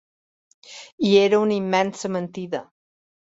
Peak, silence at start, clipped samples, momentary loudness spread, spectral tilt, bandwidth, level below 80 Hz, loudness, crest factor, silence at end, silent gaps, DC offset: -4 dBFS; 0.7 s; under 0.1%; 23 LU; -5.5 dB/octave; 8 kHz; -66 dBFS; -21 LUFS; 20 dB; 0.7 s; 0.92-0.98 s; under 0.1%